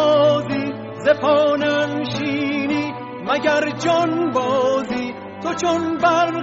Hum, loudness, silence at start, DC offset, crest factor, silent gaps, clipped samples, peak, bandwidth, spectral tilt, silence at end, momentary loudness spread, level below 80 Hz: none; -19 LUFS; 0 s; under 0.1%; 14 dB; none; under 0.1%; -4 dBFS; 7.8 kHz; -3.5 dB/octave; 0 s; 10 LU; -58 dBFS